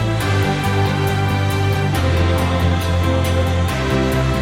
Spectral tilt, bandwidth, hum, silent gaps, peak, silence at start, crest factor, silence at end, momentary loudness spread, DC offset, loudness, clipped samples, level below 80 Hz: -6 dB/octave; 16.5 kHz; none; none; -4 dBFS; 0 s; 12 dB; 0 s; 1 LU; under 0.1%; -18 LUFS; under 0.1%; -28 dBFS